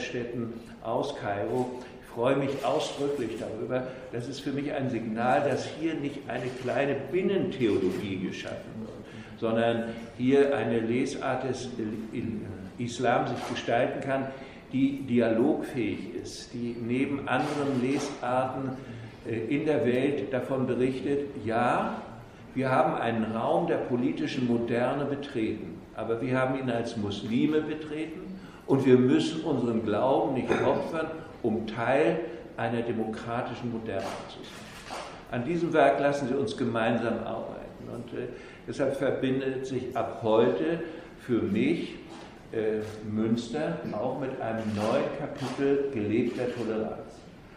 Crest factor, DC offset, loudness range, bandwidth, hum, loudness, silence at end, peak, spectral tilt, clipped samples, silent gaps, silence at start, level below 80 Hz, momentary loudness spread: 22 dB; under 0.1%; 4 LU; 12.5 kHz; none; -29 LUFS; 0 s; -8 dBFS; -6.5 dB/octave; under 0.1%; none; 0 s; -58 dBFS; 13 LU